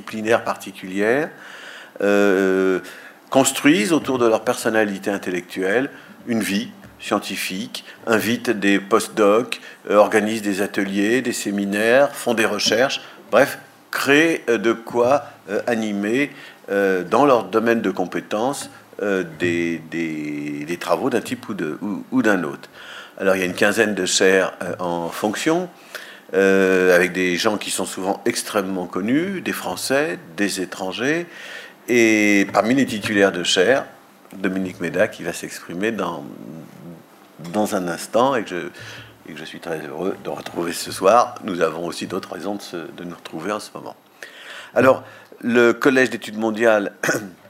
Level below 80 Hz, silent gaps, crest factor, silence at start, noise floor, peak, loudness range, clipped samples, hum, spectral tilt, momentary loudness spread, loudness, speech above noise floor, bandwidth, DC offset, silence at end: -66 dBFS; none; 20 dB; 0 s; -43 dBFS; 0 dBFS; 6 LU; under 0.1%; none; -4 dB/octave; 17 LU; -20 LUFS; 23 dB; 16 kHz; under 0.1%; 0.15 s